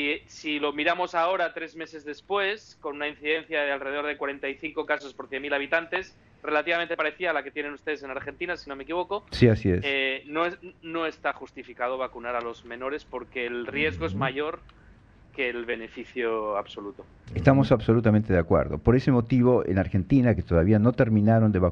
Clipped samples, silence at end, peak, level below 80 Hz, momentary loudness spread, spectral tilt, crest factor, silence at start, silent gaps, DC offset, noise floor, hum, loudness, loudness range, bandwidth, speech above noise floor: under 0.1%; 0 s; -6 dBFS; -46 dBFS; 14 LU; -7.5 dB/octave; 20 dB; 0 s; none; under 0.1%; -53 dBFS; none; -26 LUFS; 9 LU; 7.4 kHz; 28 dB